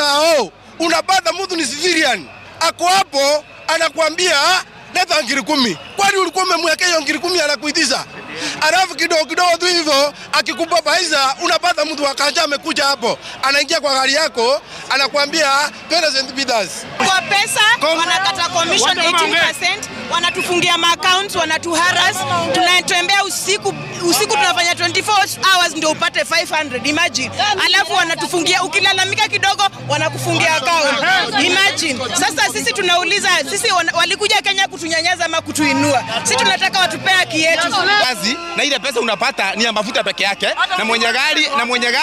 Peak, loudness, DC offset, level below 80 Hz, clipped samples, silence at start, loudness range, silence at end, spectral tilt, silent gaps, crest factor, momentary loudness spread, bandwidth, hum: -2 dBFS; -14 LUFS; under 0.1%; -56 dBFS; under 0.1%; 0 s; 2 LU; 0 s; -1.5 dB/octave; none; 14 dB; 5 LU; 16 kHz; none